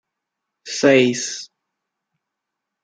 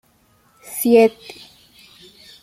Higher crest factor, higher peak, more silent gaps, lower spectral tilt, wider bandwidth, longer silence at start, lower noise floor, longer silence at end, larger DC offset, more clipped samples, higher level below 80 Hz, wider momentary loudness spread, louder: about the same, 20 dB vs 20 dB; about the same, -2 dBFS vs -2 dBFS; neither; about the same, -3.5 dB/octave vs -4 dB/octave; second, 9.6 kHz vs 16 kHz; about the same, 0.65 s vs 0.7 s; first, -82 dBFS vs -58 dBFS; about the same, 1.4 s vs 1.35 s; neither; neither; second, -70 dBFS vs -64 dBFS; second, 15 LU vs 25 LU; about the same, -17 LUFS vs -15 LUFS